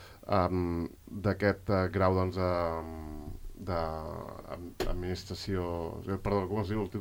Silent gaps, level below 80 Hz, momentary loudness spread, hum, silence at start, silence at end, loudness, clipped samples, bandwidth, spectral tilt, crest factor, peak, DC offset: none; -46 dBFS; 14 LU; none; 0 s; 0 s; -33 LUFS; under 0.1%; 16.5 kHz; -7.5 dB/octave; 18 dB; -14 dBFS; under 0.1%